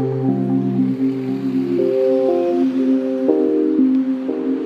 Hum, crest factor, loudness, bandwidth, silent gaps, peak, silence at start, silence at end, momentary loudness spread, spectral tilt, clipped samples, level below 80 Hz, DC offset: none; 16 dB; -18 LUFS; 5.6 kHz; none; 0 dBFS; 0 s; 0 s; 5 LU; -10 dB/octave; under 0.1%; -68 dBFS; under 0.1%